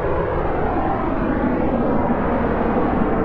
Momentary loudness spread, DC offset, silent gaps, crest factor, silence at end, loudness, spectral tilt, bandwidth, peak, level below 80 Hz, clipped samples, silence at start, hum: 2 LU; under 0.1%; none; 14 dB; 0 s; -20 LUFS; -10.5 dB/octave; 5.2 kHz; -6 dBFS; -28 dBFS; under 0.1%; 0 s; none